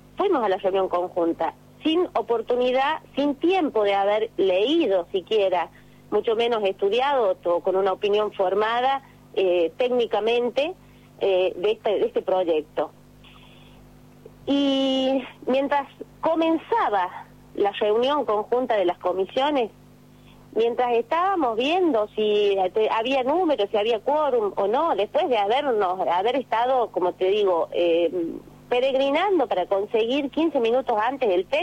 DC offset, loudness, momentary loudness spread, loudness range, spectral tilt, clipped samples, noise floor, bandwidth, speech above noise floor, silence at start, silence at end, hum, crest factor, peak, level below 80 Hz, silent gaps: under 0.1%; -23 LUFS; 5 LU; 3 LU; -5.5 dB/octave; under 0.1%; -50 dBFS; 11 kHz; 28 dB; 0.15 s; 0 s; 50 Hz at -55 dBFS; 10 dB; -12 dBFS; -60 dBFS; none